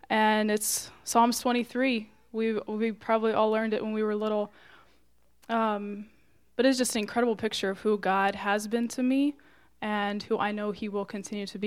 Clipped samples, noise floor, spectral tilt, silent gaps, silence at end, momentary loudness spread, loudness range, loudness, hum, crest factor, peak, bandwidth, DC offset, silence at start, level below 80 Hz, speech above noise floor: under 0.1%; -68 dBFS; -3.5 dB/octave; none; 0 s; 10 LU; 3 LU; -28 LUFS; none; 18 dB; -10 dBFS; 16 kHz; under 0.1%; 0.1 s; -68 dBFS; 40 dB